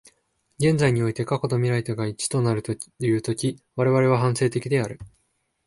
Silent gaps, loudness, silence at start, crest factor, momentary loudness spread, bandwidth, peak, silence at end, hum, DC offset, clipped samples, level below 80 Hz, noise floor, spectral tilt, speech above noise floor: none; -23 LUFS; 0.6 s; 16 dB; 8 LU; 11.5 kHz; -6 dBFS; 0.6 s; none; under 0.1%; under 0.1%; -56 dBFS; -71 dBFS; -6 dB/octave; 49 dB